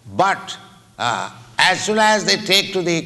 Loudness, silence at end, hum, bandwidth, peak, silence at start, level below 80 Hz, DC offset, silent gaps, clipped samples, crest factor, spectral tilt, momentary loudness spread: -17 LUFS; 0 s; none; 12.5 kHz; -2 dBFS; 0.05 s; -60 dBFS; under 0.1%; none; under 0.1%; 16 dB; -2.5 dB/octave; 12 LU